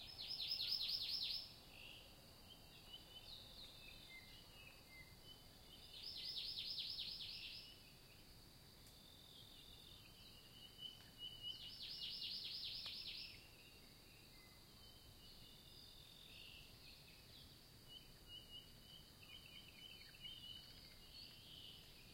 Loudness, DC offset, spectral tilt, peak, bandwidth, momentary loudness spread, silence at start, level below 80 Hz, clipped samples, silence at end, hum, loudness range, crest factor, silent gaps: -51 LUFS; under 0.1%; -2 dB/octave; -30 dBFS; 16.5 kHz; 17 LU; 0 s; -70 dBFS; under 0.1%; 0 s; none; 11 LU; 24 dB; none